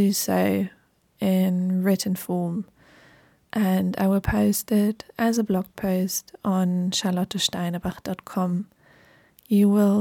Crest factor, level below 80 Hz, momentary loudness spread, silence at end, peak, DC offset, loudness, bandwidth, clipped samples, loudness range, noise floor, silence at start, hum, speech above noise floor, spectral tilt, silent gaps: 14 dB; -48 dBFS; 9 LU; 0 s; -10 dBFS; under 0.1%; -24 LUFS; 18 kHz; under 0.1%; 2 LU; -56 dBFS; 0 s; none; 33 dB; -5.5 dB/octave; none